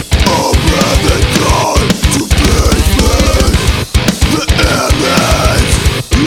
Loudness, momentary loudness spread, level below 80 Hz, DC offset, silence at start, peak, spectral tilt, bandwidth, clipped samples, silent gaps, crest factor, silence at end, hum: -10 LUFS; 3 LU; -14 dBFS; under 0.1%; 0 s; 0 dBFS; -4.5 dB/octave; 17 kHz; 0.2%; none; 10 dB; 0 s; none